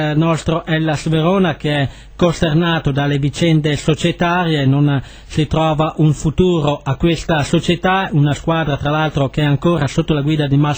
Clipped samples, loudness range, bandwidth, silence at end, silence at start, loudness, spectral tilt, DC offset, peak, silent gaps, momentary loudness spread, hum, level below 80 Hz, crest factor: under 0.1%; 1 LU; over 20 kHz; 0 s; 0 s; -16 LUFS; -6.5 dB/octave; under 0.1%; -2 dBFS; none; 3 LU; none; -34 dBFS; 14 dB